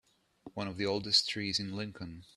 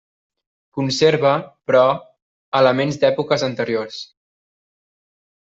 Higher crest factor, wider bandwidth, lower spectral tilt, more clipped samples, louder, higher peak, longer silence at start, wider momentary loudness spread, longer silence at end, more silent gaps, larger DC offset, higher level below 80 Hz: about the same, 22 dB vs 18 dB; first, 13 kHz vs 8 kHz; second, -3.5 dB/octave vs -5 dB/octave; neither; second, -32 LUFS vs -18 LUFS; second, -12 dBFS vs -2 dBFS; second, 0.45 s vs 0.75 s; about the same, 16 LU vs 14 LU; second, 0.1 s vs 1.35 s; second, none vs 2.22-2.52 s; neither; about the same, -66 dBFS vs -62 dBFS